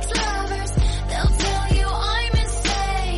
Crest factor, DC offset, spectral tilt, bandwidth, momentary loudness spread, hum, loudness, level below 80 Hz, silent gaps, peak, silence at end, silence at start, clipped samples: 10 dB; under 0.1%; -4 dB/octave; 11.5 kHz; 3 LU; none; -22 LUFS; -22 dBFS; none; -10 dBFS; 0 s; 0 s; under 0.1%